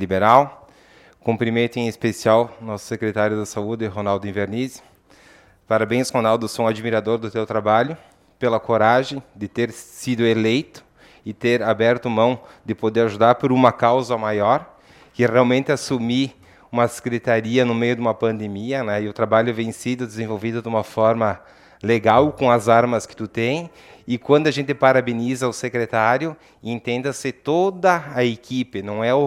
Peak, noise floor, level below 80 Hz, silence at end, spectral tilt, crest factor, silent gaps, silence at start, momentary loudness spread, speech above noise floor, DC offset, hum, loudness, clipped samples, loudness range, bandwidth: 0 dBFS; -51 dBFS; -60 dBFS; 0 s; -6 dB/octave; 20 dB; none; 0 s; 11 LU; 31 dB; under 0.1%; none; -20 LUFS; under 0.1%; 4 LU; 15 kHz